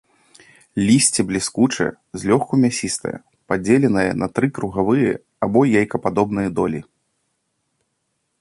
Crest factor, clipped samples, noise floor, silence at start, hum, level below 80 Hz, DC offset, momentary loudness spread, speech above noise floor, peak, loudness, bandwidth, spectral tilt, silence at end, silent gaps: 18 dB; under 0.1%; -72 dBFS; 0.75 s; none; -50 dBFS; under 0.1%; 9 LU; 54 dB; -2 dBFS; -19 LUFS; 11.5 kHz; -5 dB/octave; 1.6 s; none